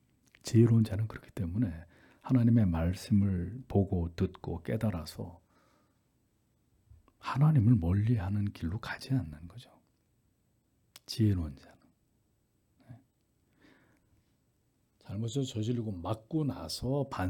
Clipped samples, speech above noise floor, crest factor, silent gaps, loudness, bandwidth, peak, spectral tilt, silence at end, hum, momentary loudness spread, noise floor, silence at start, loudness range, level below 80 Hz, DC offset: under 0.1%; 43 dB; 20 dB; none; -31 LUFS; 14.5 kHz; -12 dBFS; -7.5 dB/octave; 0 s; none; 17 LU; -74 dBFS; 0.45 s; 9 LU; -56 dBFS; under 0.1%